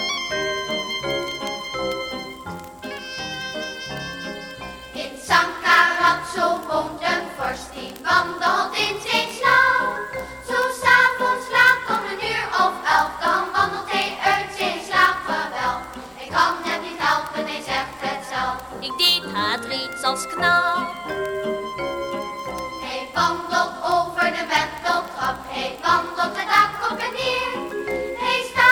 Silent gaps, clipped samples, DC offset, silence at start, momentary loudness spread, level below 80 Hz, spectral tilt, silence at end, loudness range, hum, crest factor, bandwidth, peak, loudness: none; under 0.1%; under 0.1%; 0 s; 14 LU; -52 dBFS; -2.5 dB/octave; 0 s; 7 LU; none; 20 dB; over 20 kHz; -2 dBFS; -21 LUFS